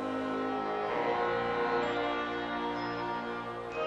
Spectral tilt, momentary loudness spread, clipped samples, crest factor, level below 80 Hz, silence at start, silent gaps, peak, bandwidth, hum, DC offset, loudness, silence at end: -5.5 dB/octave; 5 LU; under 0.1%; 14 dB; -62 dBFS; 0 s; none; -20 dBFS; 9.4 kHz; none; under 0.1%; -33 LUFS; 0 s